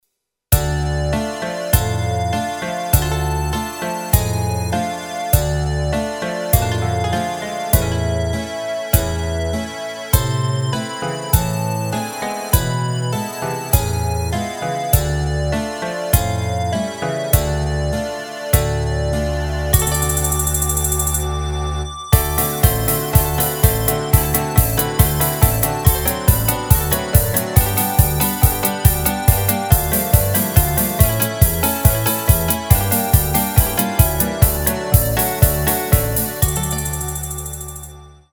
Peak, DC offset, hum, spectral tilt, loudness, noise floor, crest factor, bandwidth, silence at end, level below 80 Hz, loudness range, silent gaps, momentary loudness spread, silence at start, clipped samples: 0 dBFS; under 0.1%; none; -4.5 dB/octave; -18 LUFS; -74 dBFS; 18 dB; over 20 kHz; 0.2 s; -24 dBFS; 5 LU; none; 8 LU; 0.5 s; under 0.1%